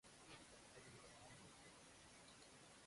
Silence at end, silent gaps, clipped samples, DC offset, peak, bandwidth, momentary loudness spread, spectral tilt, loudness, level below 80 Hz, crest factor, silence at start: 0 s; none; under 0.1%; under 0.1%; -48 dBFS; 11.5 kHz; 2 LU; -2.5 dB/octave; -63 LUFS; -80 dBFS; 16 dB; 0.05 s